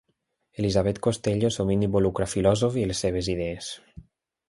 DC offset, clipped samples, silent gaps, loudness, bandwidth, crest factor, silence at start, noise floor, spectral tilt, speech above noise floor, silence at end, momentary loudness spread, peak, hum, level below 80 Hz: under 0.1%; under 0.1%; none; -25 LUFS; 11.5 kHz; 18 dB; 0.6 s; -75 dBFS; -6 dB/octave; 51 dB; 0.5 s; 11 LU; -6 dBFS; none; -44 dBFS